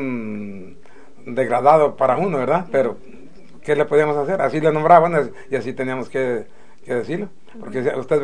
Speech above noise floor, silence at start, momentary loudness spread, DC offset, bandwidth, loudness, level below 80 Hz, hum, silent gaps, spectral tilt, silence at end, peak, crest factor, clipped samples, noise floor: 29 dB; 0 s; 17 LU; 2%; 10 kHz; -19 LUFS; -60 dBFS; none; none; -7.5 dB/octave; 0 s; 0 dBFS; 20 dB; under 0.1%; -47 dBFS